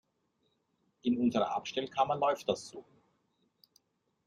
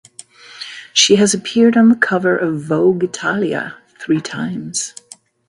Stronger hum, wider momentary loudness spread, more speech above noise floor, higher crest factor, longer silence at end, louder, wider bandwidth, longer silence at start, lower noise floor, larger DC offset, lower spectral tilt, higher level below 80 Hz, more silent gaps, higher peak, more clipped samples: neither; second, 9 LU vs 17 LU; first, 46 dB vs 26 dB; about the same, 20 dB vs 16 dB; first, 1.45 s vs 0.6 s; second, -33 LUFS vs -15 LUFS; about the same, 12 kHz vs 11.5 kHz; first, 1.05 s vs 0.5 s; first, -78 dBFS vs -40 dBFS; neither; first, -5 dB/octave vs -3.5 dB/octave; second, -74 dBFS vs -62 dBFS; neither; second, -16 dBFS vs 0 dBFS; neither